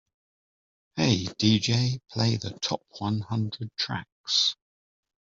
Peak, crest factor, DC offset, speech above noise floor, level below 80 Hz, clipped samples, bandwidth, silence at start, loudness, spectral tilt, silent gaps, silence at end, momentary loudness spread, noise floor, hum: -8 dBFS; 20 dB; under 0.1%; over 63 dB; -62 dBFS; under 0.1%; 7.6 kHz; 0.95 s; -27 LUFS; -4.5 dB/octave; 4.12-4.24 s; 0.85 s; 9 LU; under -90 dBFS; none